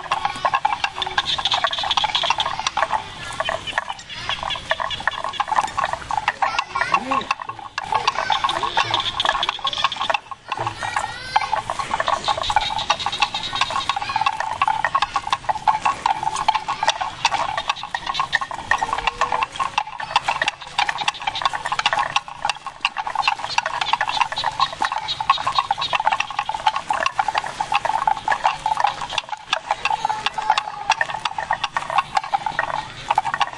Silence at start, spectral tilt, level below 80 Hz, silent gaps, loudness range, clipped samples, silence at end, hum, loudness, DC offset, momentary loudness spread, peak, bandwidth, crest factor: 0 s; -1.5 dB/octave; -48 dBFS; none; 2 LU; under 0.1%; 0 s; none; -22 LUFS; under 0.1%; 5 LU; -2 dBFS; 11.5 kHz; 20 dB